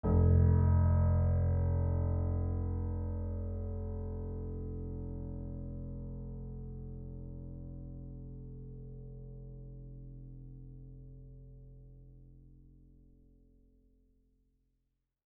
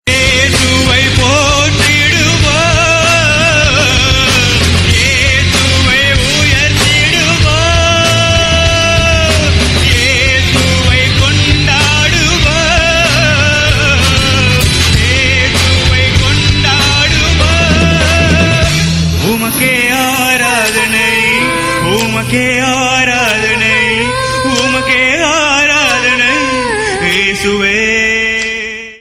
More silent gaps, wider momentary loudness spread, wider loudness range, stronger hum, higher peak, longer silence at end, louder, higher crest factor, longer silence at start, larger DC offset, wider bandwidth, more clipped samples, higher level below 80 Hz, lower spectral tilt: neither; first, 24 LU vs 3 LU; first, 23 LU vs 2 LU; neither; second, -18 dBFS vs 0 dBFS; first, 2.6 s vs 0.05 s; second, -34 LUFS vs -8 LUFS; first, 18 dB vs 10 dB; about the same, 0.05 s vs 0.05 s; neither; second, 2.1 kHz vs 15.5 kHz; neither; second, -42 dBFS vs -20 dBFS; first, -10.5 dB/octave vs -3.5 dB/octave